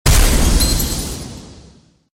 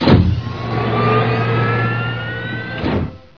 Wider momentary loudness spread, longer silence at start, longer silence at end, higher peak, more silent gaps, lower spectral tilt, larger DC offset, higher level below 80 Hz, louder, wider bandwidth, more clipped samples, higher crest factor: first, 18 LU vs 9 LU; about the same, 0.05 s vs 0 s; first, 0.6 s vs 0.2 s; about the same, -2 dBFS vs 0 dBFS; neither; second, -3.5 dB/octave vs -8.5 dB/octave; second, under 0.1% vs 0.4%; first, -18 dBFS vs -32 dBFS; about the same, -16 LUFS vs -18 LUFS; first, 16.5 kHz vs 5.4 kHz; neither; about the same, 14 dB vs 16 dB